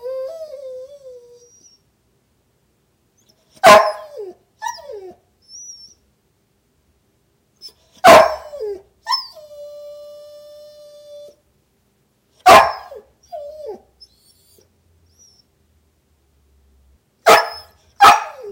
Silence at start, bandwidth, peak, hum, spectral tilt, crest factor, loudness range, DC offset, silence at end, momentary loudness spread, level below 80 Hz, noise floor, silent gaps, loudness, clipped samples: 0.05 s; 16 kHz; 0 dBFS; none; -2 dB/octave; 20 dB; 19 LU; under 0.1%; 0 s; 27 LU; -52 dBFS; -63 dBFS; none; -12 LUFS; under 0.1%